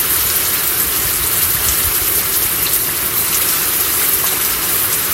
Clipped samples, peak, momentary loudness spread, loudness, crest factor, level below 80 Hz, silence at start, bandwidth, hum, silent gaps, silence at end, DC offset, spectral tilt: under 0.1%; 0 dBFS; 1 LU; -12 LUFS; 16 dB; -36 dBFS; 0 s; 16.5 kHz; none; none; 0 s; under 0.1%; -0.5 dB/octave